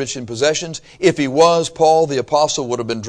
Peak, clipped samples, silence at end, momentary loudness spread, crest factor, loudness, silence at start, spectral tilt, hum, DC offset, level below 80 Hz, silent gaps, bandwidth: 0 dBFS; under 0.1%; 0 s; 9 LU; 16 dB; -16 LUFS; 0 s; -4 dB/octave; none; under 0.1%; -52 dBFS; none; 10.5 kHz